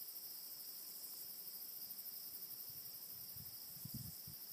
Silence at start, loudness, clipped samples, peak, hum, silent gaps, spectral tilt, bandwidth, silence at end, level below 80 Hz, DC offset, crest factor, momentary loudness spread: 0 s; -48 LUFS; under 0.1%; -36 dBFS; none; none; -2 dB/octave; 15.5 kHz; 0 s; -76 dBFS; under 0.1%; 16 dB; 2 LU